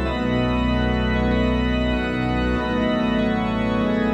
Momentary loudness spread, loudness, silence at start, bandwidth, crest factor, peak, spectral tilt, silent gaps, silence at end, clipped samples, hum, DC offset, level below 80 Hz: 2 LU; -21 LUFS; 0 s; 8 kHz; 12 dB; -8 dBFS; -7.5 dB/octave; none; 0 s; under 0.1%; none; under 0.1%; -28 dBFS